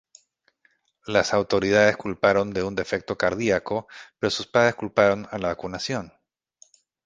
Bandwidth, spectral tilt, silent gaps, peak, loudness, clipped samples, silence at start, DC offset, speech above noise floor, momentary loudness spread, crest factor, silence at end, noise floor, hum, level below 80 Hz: 9.6 kHz; -4.5 dB/octave; none; -2 dBFS; -23 LUFS; under 0.1%; 1.05 s; under 0.1%; 44 dB; 10 LU; 22 dB; 0.95 s; -67 dBFS; none; -54 dBFS